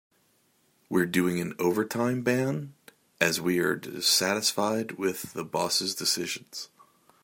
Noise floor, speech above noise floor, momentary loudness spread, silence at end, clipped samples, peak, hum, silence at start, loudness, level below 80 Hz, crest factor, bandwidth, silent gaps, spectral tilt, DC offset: -68 dBFS; 40 dB; 12 LU; 0.6 s; under 0.1%; -6 dBFS; none; 0.9 s; -27 LUFS; -72 dBFS; 22 dB; 16.5 kHz; none; -3.5 dB/octave; under 0.1%